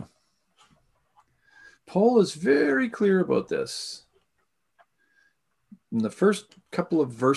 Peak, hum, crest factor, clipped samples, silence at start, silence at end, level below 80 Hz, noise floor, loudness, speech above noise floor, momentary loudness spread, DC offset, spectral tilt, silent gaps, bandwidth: -8 dBFS; none; 18 dB; under 0.1%; 0 s; 0 s; -68 dBFS; -76 dBFS; -25 LUFS; 53 dB; 12 LU; under 0.1%; -6 dB/octave; none; 12.5 kHz